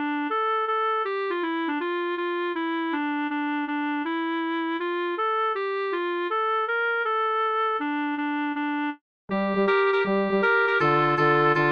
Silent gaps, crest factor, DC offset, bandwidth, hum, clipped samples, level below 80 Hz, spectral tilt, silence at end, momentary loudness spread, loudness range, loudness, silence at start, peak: 9.01-9.28 s; 16 dB; under 0.1%; 6.6 kHz; none; under 0.1%; -70 dBFS; -7.5 dB/octave; 0 s; 7 LU; 4 LU; -25 LUFS; 0 s; -8 dBFS